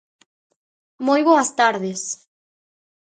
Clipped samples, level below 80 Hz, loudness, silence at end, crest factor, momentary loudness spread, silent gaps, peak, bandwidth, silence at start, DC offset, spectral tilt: under 0.1%; -78 dBFS; -19 LUFS; 1 s; 20 dB; 13 LU; none; -2 dBFS; 9.6 kHz; 1 s; under 0.1%; -3.5 dB/octave